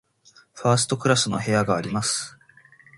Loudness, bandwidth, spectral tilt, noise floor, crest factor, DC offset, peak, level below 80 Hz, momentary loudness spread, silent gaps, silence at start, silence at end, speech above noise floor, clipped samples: -22 LUFS; 11.5 kHz; -4 dB/octave; -56 dBFS; 22 dB; under 0.1%; -4 dBFS; -58 dBFS; 7 LU; none; 0.55 s; 0.7 s; 34 dB; under 0.1%